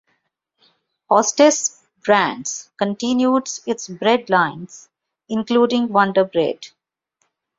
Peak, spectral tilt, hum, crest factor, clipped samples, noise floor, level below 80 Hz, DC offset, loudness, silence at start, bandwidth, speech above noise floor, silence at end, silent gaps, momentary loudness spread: -2 dBFS; -3.5 dB/octave; none; 18 dB; under 0.1%; -71 dBFS; -66 dBFS; under 0.1%; -18 LUFS; 1.1 s; 7.8 kHz; 53 dB; 0.9 s; none; 12 LU